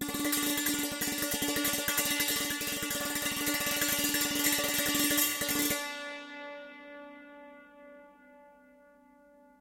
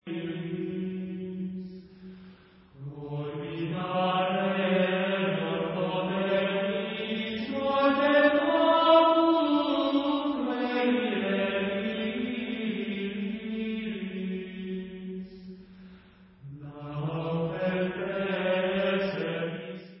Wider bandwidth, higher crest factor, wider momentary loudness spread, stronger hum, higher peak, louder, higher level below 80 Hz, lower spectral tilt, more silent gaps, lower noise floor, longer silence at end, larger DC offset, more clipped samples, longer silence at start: first, 17 kHz vs 5.8 kHz; about the same, 22 dB vs 20 dB; about the same, 19 LU vs 18 LU; neither; second, -12 dBFS vs -8 dBFS; about the same, -29 LUFS vs -28 LUFS; about the same, -60 dBFS vs -64 dBFS; second, -1 dB/octave vs -10 dB/octave; neither; first, -60 dBFS vs -54 dBFS; first, 1.1 s vs 0 s; neither; neither; about the same, 0 s vs 0.05 s